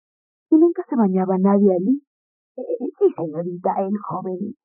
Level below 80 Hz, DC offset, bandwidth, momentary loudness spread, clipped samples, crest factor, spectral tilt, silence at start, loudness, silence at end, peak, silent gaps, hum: -72 dBFS; under 0.1%; 2.8 kHz; 11 LU; under 0.1%; 16 dB; -12 dB/octave; 0.5 s; -20 LUFS; 0.1 s; -6 dBFS; 2.07-2.55 s; none